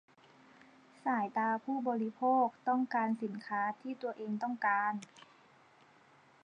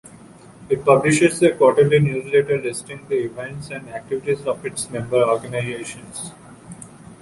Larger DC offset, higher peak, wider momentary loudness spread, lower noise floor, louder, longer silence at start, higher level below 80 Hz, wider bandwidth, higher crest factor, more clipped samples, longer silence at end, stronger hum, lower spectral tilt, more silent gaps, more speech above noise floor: neither; second, -20 dBFS vs -2 dBFS; second, 9 LU vs 17 LU; first, -64 dBFS vs -44 dBFS; second, -35 LUFS vs -19 LUFS; first, 1.05 s vs 0.15 s; second, under -90 dBFS vs -54 dBFS; second, 9.4 kHz vs 11.5 kHz; about the same, 16 dB vs 18 dB; neither; first, 1.25 s vs 0.05 s; neither; about the same, -6.5 dB/octave vs -5.5 dB/octave; neither; first, 30 dB vs 25 dB